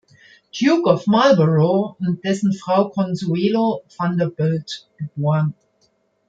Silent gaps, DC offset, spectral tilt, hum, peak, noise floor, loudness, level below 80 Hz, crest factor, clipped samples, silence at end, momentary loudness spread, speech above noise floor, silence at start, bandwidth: none; under 0.1%; -7 dB/octave; none; -2 dBFS; -63 dBFS; -19 LUFS; -62 dBFS; 16 dB; under 0.1%; 0.75 s; 10 LU; 45 dB; 0.55 s; 7.8 kHz